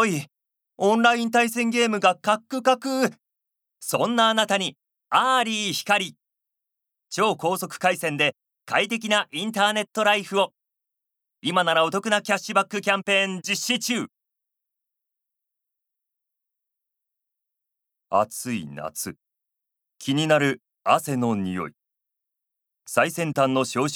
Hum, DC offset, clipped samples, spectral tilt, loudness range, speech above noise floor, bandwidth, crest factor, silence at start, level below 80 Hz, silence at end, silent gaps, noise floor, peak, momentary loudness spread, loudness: none; under 0.1%; under 0.1%; -3.5 dB/octave; 9 LU; 62 dB; 19 kHz; 22 dB; 0 s; -74 dBFS; 0 s; none; -84 dBFS; -4 dBFS; 11 LU; -23 LUFS